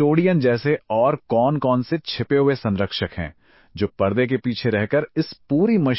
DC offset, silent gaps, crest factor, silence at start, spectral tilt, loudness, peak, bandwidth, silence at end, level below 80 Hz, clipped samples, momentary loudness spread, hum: under 0.1%; none; 16 dB; 0 s; -11 dB/octave; -21 LUFS; -4 dBFS; 5.8 kHz; 0 s; -46 dBFS; under 0.1%; 9 LU; none